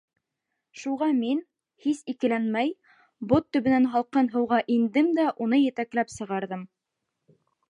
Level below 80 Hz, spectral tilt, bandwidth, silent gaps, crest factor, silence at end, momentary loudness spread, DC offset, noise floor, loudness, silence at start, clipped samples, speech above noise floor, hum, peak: -64 dBFS; -6 dB/octave; 10.5 kHz; none; 18 dB; 1.05 s; 10 LU; under 0.1%; -83 dBFS; -25 LUFS; 0.75 s; under 0.1%; 58 dB; none; -8 dBFS